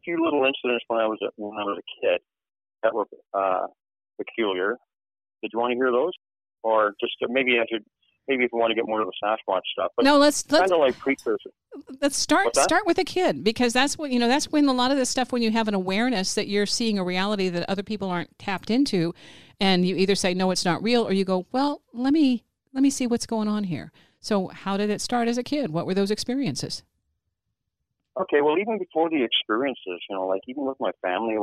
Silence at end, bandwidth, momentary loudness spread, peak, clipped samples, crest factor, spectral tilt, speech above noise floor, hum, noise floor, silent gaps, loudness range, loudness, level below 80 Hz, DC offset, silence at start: 0 s; 15.5 kHz; 10 LU; -8 dBFS; under 0.1%; 18 dB; -4 dB/octave; 57 dB; none; -81 dBFS; none; 6 LU; -24 LUFS; -58 dBFS; under 0.1%; 0.05 s